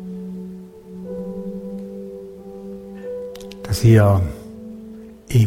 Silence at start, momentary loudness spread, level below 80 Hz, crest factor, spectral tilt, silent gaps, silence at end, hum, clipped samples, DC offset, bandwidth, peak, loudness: 0 s; 23 LU; -42 dBFS; 20 dB; -7.5 dB/octave; none; 0 s; none; under 0.1%; under 0.1%; 16 kHz; -2 dBFS; -20 LUFS